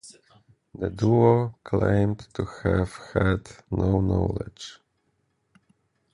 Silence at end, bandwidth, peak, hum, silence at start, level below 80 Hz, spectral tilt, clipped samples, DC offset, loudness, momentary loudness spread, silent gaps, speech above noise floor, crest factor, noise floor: 1.4 s; 11 kHz; -6 dBFS; none; 0.05 s; -40 dBFS; -8 dB/octave; under 0.1%; under 0.1%; -25 LUFS; 14 LU; none; 48 dB; 20 dB; -72 dBFS